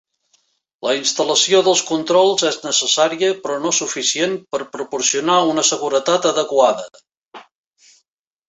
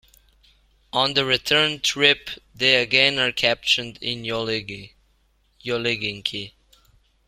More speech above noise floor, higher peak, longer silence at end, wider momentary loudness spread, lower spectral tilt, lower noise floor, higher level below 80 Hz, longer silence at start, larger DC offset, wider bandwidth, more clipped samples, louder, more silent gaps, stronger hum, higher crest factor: first, 52 dB vs 41 dB; about the same, 0 dBFS vs -2 dBFS; first, 1.05 s vs 0.8 s; second, 10 LU vs 15 LU; about the same, -1.5 dB/octave vs -2.5 dB/octave; first, -69 dBFS vs -63 dBFS; second, -66 dBFS vs -56 dBFS; about the same, 0.85 s vs 0.95 s; neither; second, 8.4 kHz vs 16.5 kHz; neither; first, -17 LUFS vs -20 LUFS; first, 7.17-7.31 s vs none; neither; about the same, 18 dB vs 22 dB